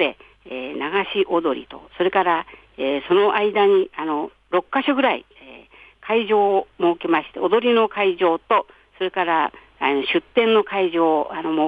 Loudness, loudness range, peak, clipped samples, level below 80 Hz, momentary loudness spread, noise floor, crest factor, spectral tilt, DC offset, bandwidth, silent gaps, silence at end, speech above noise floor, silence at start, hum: -20 LUFS; 2 LU; -4 dBFS; under 0.1%; -60 dBFS; 10 LU; -47 dBFS; 16 dB; -7 dB/octave; under 0.1%; 4.9 kHz; none; 0 s; 27 dB; 0 s; none